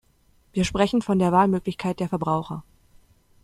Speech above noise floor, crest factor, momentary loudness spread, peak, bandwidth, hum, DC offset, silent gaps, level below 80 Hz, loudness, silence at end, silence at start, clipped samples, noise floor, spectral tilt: 38 dB; 20 dB; 12 LU; -4 dBFS; 12.5 kHz; none; under 0.1%; none; -48 dBFS; -23 LUFS; 0.85 s; 0.55 s; under 0.1%; -61 dBFS; -6.5 dB/octave